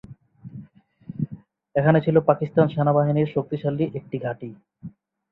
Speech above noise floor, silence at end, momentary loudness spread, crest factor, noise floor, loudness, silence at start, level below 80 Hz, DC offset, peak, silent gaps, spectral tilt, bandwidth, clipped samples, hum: 26 dB; 0.4 s; 23 LU; 20 dB; -48 dBFS; -22 LUFS; 0.1 s; -60 dBFS; under 0.1%; -2 dBFS; none; -11.5 dB/octave; 4.2 kHz; under 0.1%; none